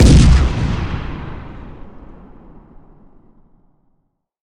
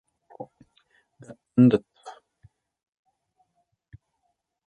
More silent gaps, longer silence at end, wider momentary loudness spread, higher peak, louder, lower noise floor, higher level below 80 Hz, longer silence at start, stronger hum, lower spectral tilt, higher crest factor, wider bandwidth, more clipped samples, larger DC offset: neither; about the same, 2.5 s vs 2.55 s; about the same, 27 LU vs 27 LU; first, 0 dBFS vs -6 dBFS; first, -15 LUFS vs -21 LUFS; second, -65 dBFS vs -77 dBFS; first, -20 dBFS vs -66 dBFS; second, 0 s vs 0.4 s; neither; second, -6 dB/octave vs -9.5 dB/octave; second, 16 dB vs 24 dB; first, 10.5 kHz vs 4.6 kHz; neither; neither